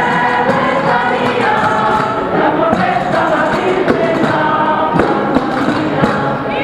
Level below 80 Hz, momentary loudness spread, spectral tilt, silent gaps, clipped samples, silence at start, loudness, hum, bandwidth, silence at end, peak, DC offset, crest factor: -42 dBFS; 2 LU; -6.5 dB/octave; none; under 0.1%; 0 s; -13 LUFS; none; 13.5 kHz; 0 s; 0 dBFS; under 0.1%; 14 dB